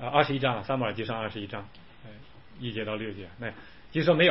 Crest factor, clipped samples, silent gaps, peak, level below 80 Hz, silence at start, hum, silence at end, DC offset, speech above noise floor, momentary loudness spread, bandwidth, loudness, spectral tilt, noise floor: 20 dB; under 0.1%; none; -8 dBFS; -58 dBFS; 0 s; none; 0 s; 0.3%; 22 dB; 24 LU; 5.8 kHz; -30 LUFS; -9.5 dB/octave; -50 dBFS